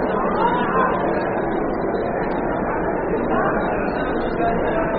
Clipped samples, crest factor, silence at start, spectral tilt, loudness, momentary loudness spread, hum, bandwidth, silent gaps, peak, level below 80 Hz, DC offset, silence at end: under 0.1%; 14 dB; 0 s; -5.5 dB/octave; -21 LUFS; 4 LU; none; 4.8 kHz; none; -6 dBFS; -36 dBFS; under 0.1%; 0 s